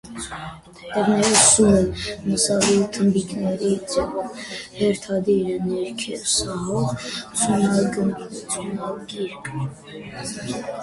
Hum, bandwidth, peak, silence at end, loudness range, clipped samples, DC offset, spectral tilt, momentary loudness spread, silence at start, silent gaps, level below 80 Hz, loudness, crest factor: none; 11.5 kHz; 0 dBFS; 0 s; 7 LU; under 0.1%; under 0.1%; -4 dB/octave; 16 LU; 0.05 s; none; -46 dBFS; -21 LUFS; 22 dB